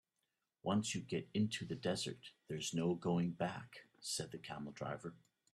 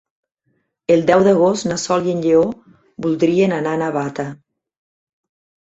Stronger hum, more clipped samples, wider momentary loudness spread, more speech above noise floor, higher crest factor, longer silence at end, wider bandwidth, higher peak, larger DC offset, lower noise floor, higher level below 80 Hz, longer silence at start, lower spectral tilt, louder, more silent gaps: neither; neither; about the same, 11 LU vs 13 LU; second, 47 dB vs 52 dB; about the same, 18 dB vs 18 dB; second, 0.4 s vs 1.25 s; first, 13 kHz vs 8.2 kHz; second, -24 dBFS vs 0 dBFS; neither; first, -88 dBFS vs -68 dBFS; second, -76 dBFS vs -58 dBFS; second, 0.65 s vs 0.9 s; about the same, -5 dB/octave vs -6 dB/octave; second, -41 LUFS vs -17 LUFS; neither